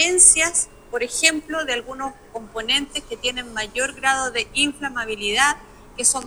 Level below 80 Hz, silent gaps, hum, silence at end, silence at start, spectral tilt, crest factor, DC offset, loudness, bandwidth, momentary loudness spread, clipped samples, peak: -48 dBFS; none; none; 0 s; 0 s; 0.5 dB/octave; 22 dB; under 0.1%; -19 LUFS; over 20 kHz; 15 LU; under 0.1%; 0 dBFS